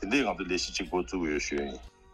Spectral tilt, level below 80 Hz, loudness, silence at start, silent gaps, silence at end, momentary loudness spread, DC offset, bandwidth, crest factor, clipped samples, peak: -3.5 dB/octave; -48 dBFS; -31 LUFS; 0 s; none; 0.25 s; 8 LU; under 0.1%; 12.5 kHz; 18 dB; under 0.1%; -14 dBFS